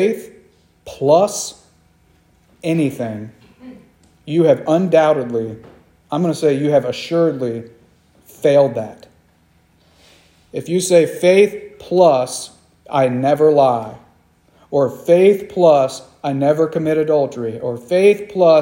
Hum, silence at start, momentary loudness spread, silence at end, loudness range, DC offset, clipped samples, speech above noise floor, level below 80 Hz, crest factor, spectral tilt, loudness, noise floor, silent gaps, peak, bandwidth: none; 0 s; 15 LU; 0 s; 6 LU; under 0.1%; under 0.1%; 40 dB; -60 dBFS; 16 dB; -6 dB/octave; -16 LUFS; -55 dBFS; none; 0 dBFS; 16.5 kHz